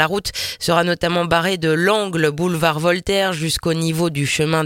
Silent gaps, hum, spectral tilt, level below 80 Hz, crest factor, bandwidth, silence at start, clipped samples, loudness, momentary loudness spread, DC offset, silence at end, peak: none; none; -4.5 dB/octave; -44 dBFS; 18 dB; 17 kHz; 0 s; under 0.1%; -18 LUFS; 3 LU; under 0.1%; 0 s; 0 dBFS